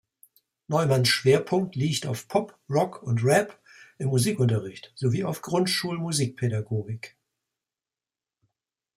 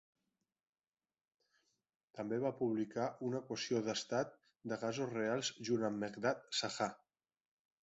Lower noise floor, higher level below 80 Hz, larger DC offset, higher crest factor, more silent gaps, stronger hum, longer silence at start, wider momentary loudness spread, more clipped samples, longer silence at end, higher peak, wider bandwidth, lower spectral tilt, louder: about the same, under -90 dBFS vs under -90 dBFS; first, -64 dBFS vs -80 dBFS; neither; about the same, 20 dB vs 20 dB; neither; neither; second, 0.7 s vs 2.15 s; first, 10 LU vs 5 LU; neither; first, 1.9 s vs 0.85 s; first, -8 dBFS vs -20 dBFS; first, 16 kHz vs 8 kHz; about the same, -5 dB/octave vs -4 dB/octave; first, -25 LUFS vs -40 LUFS